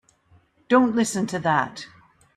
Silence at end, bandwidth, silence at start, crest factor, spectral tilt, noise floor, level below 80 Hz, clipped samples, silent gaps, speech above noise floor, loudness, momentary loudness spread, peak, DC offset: 0.5 s; 13.5 kHz; 0.7 s; 18 dB; -5 dB/octave; -59 dBFS; -64 dBFS; under 0.1%; none; 38 dB; -22 LUFS; 17 LU; -6 dBFS; under 0.1%